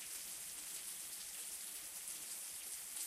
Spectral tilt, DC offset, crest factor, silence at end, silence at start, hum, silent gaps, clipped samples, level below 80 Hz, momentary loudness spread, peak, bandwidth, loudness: 2 dB/octave; under 0.1%; 18 dB; 0 s; 0 s; none; none; under 0.1%; -80 dBFS; 1 LU; -30 dBFS; 16 kHz; -45 LUFS